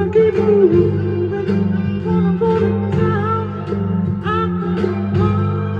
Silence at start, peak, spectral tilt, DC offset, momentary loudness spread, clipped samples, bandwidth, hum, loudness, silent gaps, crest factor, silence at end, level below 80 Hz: 0 s; -2 dBFS; -10 dB/octave; under 0.1%; 7 LU; under 0.1%; 6.6 kHz; none; -17 LUFS; none; 14 dB; 0 s; -42 dBFS